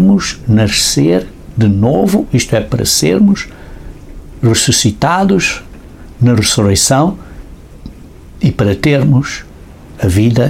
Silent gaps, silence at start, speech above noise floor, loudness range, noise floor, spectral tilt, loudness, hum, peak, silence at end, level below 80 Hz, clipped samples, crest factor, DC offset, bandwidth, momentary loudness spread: none; 0 s; 23 dB; 3 LU; -33 dBFS; -4.5 dB/octave; -11 LUFS; none; 0 dBFS; 0 s; -32 dBFS; under 0.1%; 12 dB; under 0.1%; 16.5 kHz; 7 LU